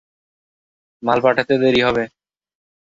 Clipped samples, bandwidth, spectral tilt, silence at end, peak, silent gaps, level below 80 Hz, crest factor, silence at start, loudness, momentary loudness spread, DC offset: under 0.1%; 7.8 kHz; -6 dB/octave; 0.9 s; 0 dBFS; none; -52 dBFS; 20 dB; 1 s; -17 LUFS; 10 LU; under 0.1%